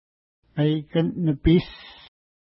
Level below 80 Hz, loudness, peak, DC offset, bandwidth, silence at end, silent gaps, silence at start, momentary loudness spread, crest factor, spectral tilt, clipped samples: -40 dBFS; -23 LUFS; -8 dBFS; under 0.1%; 5.8 kHz; 0.5 s; none; 0.55 s; 17 LU; 16 dB; -12 dB/octave; under 0.1%